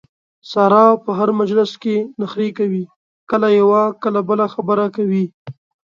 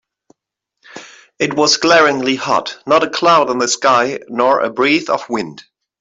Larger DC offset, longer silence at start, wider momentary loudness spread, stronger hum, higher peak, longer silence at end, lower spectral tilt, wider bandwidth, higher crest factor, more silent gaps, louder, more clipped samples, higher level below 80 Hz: neither; second, 0.45 s vs 0.95 s; about the same, 10 LU vs 11 LU; neither; about the same, 0 dBFS vs 0 dBFS; about the same, 0.45 s vs 0.4 s; first, -8 dB/octave vs -2.5 dB/octave; second, 7.2 kHz vs 8.4 kHz; about the same, 16 dB vs 16 dB; first, 2.96-3.27 s, 5.34-5.45 s vs none; about the same, -16 LUFS vs -14 LUFS; neither; second, -66 dBFS vs -60 dBFS